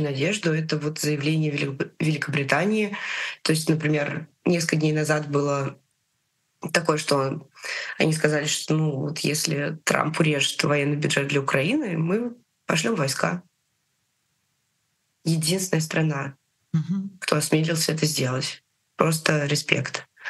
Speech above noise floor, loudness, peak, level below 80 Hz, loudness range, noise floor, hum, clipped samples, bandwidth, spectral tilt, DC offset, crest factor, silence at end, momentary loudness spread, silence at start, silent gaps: 49 dB; -24 LUFS; 0 dBFS; -68 dBFS; 5 LU; -73 dBFS; none; under 0.1%; 12.5 kHz; -4.5 dB/octave; under 0.1%; 24 dB; 0 s; 7 LU; 0 s; none